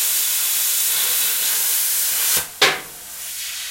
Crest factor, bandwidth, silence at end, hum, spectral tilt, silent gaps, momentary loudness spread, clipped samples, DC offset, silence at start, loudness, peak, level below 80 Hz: 18 dB; 16.5 kHz; 0 s; none; 2 dB/octave; none; 11 LU; under 0.1%; under 0.1%; 0 s; -17 LUFS; -2 dBFS; -62 dBFS